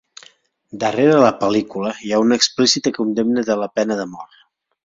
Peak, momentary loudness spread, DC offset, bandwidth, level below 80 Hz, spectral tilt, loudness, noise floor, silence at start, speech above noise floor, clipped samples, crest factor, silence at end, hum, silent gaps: 0 dBFS; 11 LU; under 0.1%; 7.8 kHz; -60 dBFS; -4 dB/octave; -17 LUFS; -52 dBFS; 0.75 s; 34 dB; under 0.1%; 18 dB; 0.6 s; none; none